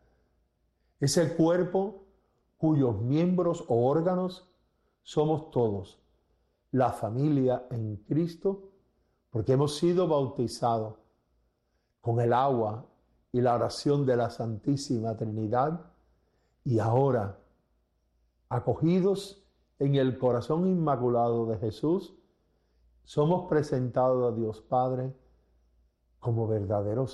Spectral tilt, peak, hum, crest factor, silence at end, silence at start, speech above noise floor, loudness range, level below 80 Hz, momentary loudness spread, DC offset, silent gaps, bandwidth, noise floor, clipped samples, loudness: -7.5 dB/octave; -12 dBFS; none; 16 dB; 0 s; 1 s; 48 dB; 3 LU; -62 dBFS; 9 LU; under 0.1%; none; 12 kHz; -75 dBFS; under 0.1%; -28 LUFS